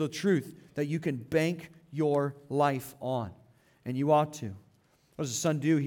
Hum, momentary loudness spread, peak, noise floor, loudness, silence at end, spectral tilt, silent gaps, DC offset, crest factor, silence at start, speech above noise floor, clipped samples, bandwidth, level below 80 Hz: none; 15 LU; -12 dBFS; -66 dBFS; -30 LUFS; 0 s; -6 dB/octave; none; under 0.1%; 18 dB; 0 s; 36 dB; under 0.1%; 18.5 kHz; -70 dBFS